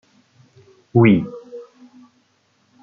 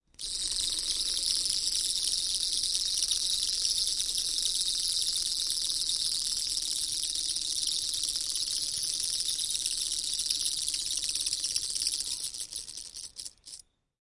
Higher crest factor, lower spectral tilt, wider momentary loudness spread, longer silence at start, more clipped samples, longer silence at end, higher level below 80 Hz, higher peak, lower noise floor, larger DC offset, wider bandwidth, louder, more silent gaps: about the same, 20 dB vs 20 dB; first, -7.5 dB/octave vs 2.5 dB/octave; first, 25 LU vs 8 LU; first, 0.95 s vs 0.2 s; neither; first, 1.2 s vs 0.6 s; about the same, -58 dBFS vs -56 dBFS; first, -2 dBFS vs -10 dBFS; first, -62 dBFS vs -51 dBFS; neither; second, 3.8 kHz vs 11.5 kHz; first, -16 LUFS vs -28 LUFS; neither